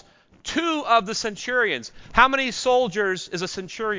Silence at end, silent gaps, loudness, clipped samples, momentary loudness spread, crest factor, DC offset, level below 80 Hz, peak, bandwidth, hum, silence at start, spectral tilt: 0 s; none; -22 LUFS; under 0.1%; 11 LU; 22 dB; under 0.1%; -48 dBFS; -2 dBFS; 7.6 kHz; none; 0.45 s; -3 dB/octave